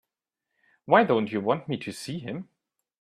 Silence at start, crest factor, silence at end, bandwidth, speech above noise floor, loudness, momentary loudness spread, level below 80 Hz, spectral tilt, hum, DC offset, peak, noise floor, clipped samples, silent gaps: 0.85 s; 24 dB; 0.6 s; 14.5 kHz; 60 dB; -26 LUFS; 15 LU; -70 dBFS; -6 dB/octave; none; under 0.1%; -4 dBFS; -86 dBFS; under 0.1%; none